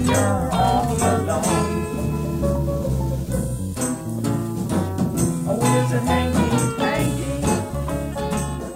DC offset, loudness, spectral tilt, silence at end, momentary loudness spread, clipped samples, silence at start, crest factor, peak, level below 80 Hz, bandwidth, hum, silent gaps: under 0.1%; -22 LUFS; -5.5 dB/octave; 0 s; 6 LU; under 0.1%; 0 s; 14 dB; -6 dBFS; -34 dBFS; 16 kHz; none; none